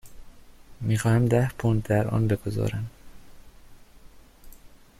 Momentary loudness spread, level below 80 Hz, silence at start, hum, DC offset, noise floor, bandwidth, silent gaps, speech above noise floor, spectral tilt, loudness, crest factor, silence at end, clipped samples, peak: 11 LU; -46 dBFS; 0.05 s; none; under 0.1%; -49 dBFS; 14.5 kHz; none; 26 dB; -7.5 dB/octave; -25 LUFS; 20 dB; 0.35 s; under 0.1%; -8 dBFS